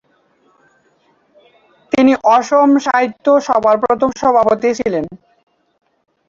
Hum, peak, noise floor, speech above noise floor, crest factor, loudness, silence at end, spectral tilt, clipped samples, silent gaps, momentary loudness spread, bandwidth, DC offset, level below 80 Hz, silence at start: none; -2 dBFS; -57 dBFS; 44 dB; 14 dB; -13 LUFS; 1.15 s; -5 dB/octave; under 0.1%; none; 8 LU; 7.6 kHz; under 0.1%; -54 dBFS; 1.95 s